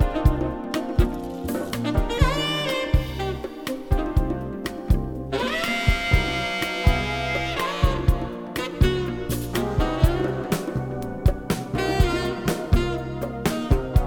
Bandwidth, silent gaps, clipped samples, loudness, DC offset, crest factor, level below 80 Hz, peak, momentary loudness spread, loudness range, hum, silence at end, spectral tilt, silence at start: 19.5 kHz; none; under 0.1%; -25 LUFS; under 0.1%; 20 dB; -28 dBFS; -4 dBFS; 7 LU; 2 LU; none; 0 s; -6 dB/octave; 0 s